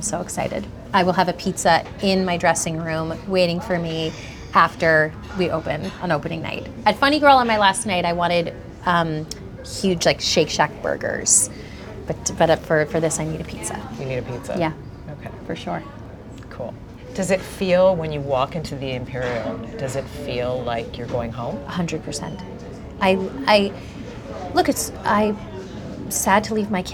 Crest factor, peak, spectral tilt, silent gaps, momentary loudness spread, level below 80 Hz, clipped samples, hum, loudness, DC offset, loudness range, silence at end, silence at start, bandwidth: 20 dB; -2 dBFS; -4 dB/octave; none; 17 LU; -42 dBFS; under 0.1%; none; -21 LUFS; under 0.1%; 8 LU; 0 s; 0 s; 20 kHz